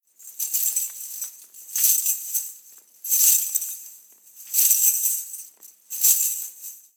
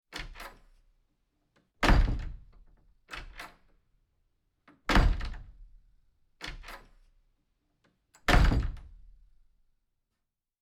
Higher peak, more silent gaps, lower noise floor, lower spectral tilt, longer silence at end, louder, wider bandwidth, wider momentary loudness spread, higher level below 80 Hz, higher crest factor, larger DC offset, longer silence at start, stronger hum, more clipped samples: first, -2 dBFS vs -8 dBFS; neither; second, -49 dBFS vs -85 dBFS; second, 6 dB/octave vs -5.5 dB/octave; second, 0.2 s vs 1.75 s; first, -20 LUFS vs -29 LUFS; first, over 20 kHz vs 13.5 kHz; second, 19 LU vs 23 LU; second, under -90 dBFS vs -34 dBFS; about the same, 22 dB vs 24 dB; neither; about the same, 0.2 s vs 0.15 s; neither; neither